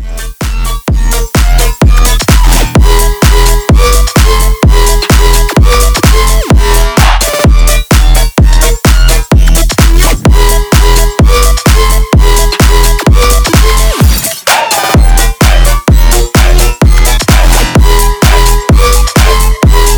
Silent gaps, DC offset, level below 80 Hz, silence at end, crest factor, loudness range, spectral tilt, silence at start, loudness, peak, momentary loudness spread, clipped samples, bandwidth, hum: none; 0.7%; -6 dBFS; 0 s; 4 dB; 0 LU; -4 dB/octave; 0 s; -7 LUFS; 0 dBFS; 2 LU; 4%; over 20 kHz; none